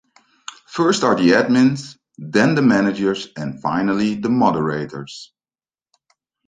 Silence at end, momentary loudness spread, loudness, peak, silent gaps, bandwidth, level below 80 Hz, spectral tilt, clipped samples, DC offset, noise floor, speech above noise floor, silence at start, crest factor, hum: 1.2 s; 22 LU; -18 LUFS; -2 dBFS; none; 9.4 kHz; -58 dBFS; -5.5 dB/octave; under 0.1%; under 0.1%; under -90 dBFS; over 73 dB; 0.7 s; 18 dB; none